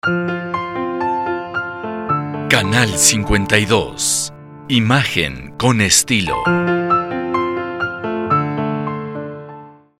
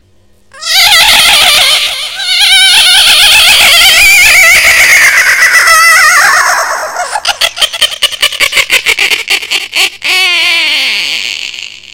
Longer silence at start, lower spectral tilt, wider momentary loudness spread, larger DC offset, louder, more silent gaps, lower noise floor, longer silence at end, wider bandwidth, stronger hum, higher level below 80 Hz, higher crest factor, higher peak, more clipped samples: second, 0.05 s vs 0.55 s; first, -3.5 dB/octave vs 2 dB/octave; about the same, 13 LU vs 11 LU; second, under 0.1% vs 0.4%; second, -17 LUFS vs -3 LUFS; neither; second, -38 dBFS vs -46 dBFS; about the same, 0.25 s vs 0.25 s; second, 16.5 kHz vs over 20 kHz; neither; about the same, -38 dBFS vs -36 dBFS; first, 18 dB vs 6 dB; about the same, 0 dBFS vs 0 dBFS; second, under 0.1% vs 5%